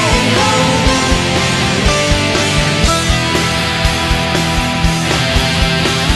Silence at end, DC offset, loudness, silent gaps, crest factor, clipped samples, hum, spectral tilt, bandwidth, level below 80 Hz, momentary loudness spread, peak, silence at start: 0 s; under 0.1%; -12 LUFS; none; 12 dB; under 0.1%; none; -4 dB/octave; 12.5 kHz; -20 dBFS; 3 LU; 0 dBFS; 0 s